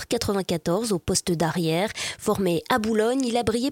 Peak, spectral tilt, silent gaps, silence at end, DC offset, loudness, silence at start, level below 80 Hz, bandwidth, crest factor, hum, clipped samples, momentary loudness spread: -6 dBFS; -4.5 dB/octave; none; 0 s; under 0.1%; -24 LUFS; 0 s; -50 dBFS; 17 kHz; 18 dB; none; under 0.1%; 3 LU